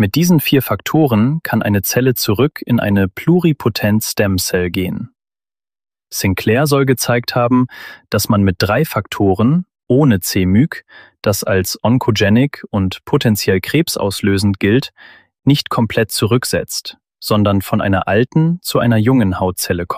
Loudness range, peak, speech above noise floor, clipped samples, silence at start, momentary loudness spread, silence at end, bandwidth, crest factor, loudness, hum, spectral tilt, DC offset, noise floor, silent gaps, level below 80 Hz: 2 LU; -2 dBFS; over 76 dB; under 0.1%; 0 s; 7 LU; 0 s; 15.5 kHz; 14 dB; -15 LUFS; none; -5.5 dB/octave; 0.1%; under -90 dBFS; none; -46 dBFS